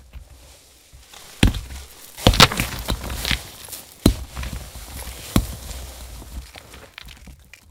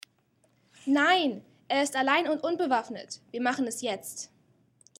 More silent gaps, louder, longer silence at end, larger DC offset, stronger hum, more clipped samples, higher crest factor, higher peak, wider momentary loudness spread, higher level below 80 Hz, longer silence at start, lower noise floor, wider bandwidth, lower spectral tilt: neither; first, -20 LUFS vs -27 LUFS; second, 0.35 s vs 0.75 s; neither; neither; neither; about the same, 24 dB vs 20 dB; first, 0 dBFS vs -10 dBFS; first, 26 LU vs 16 LU; first, -30 dBFS vs -82 dBFS; second, 0.15 s vs 0.85 s; second, -48 dBFS vs -69 dBFS; first, 18 kHz vs 16 kHz; first, -4 dB/octave vs -2.5 dB/octave